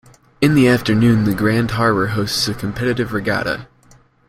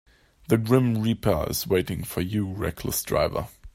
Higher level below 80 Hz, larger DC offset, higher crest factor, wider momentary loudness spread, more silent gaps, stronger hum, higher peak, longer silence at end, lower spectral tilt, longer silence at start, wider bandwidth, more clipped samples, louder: about the same, -42 dBFS vs -44 dBFS; neither; about the same, 16 dB vs 20 dB; about the same, 7 LU vs 8 LU; neither; neither; first, -2 dBFS vs -6 dBFS; first, 0.65 s vs 0.05 s; about the same, -6 dB/octave vs -5.5 dB/octave; about the same, 0.4 s vs 0.5 s; about the same, 16 kHz vs 16 kHz; neither; first, -17 LUFS vs -25 LUFS